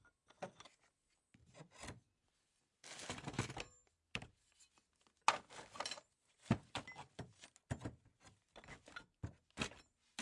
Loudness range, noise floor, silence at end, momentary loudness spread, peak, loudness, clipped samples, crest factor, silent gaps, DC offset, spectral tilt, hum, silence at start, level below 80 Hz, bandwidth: 8 LU; -83 dBFS; 0 s; 22 LU; -14 dBFS; -47 LUFS; under 0.1%; 36 dB; none; under 0.1%; -4 dB/octave; none; 0.05 s; -70 dBFS; 11.5 kHz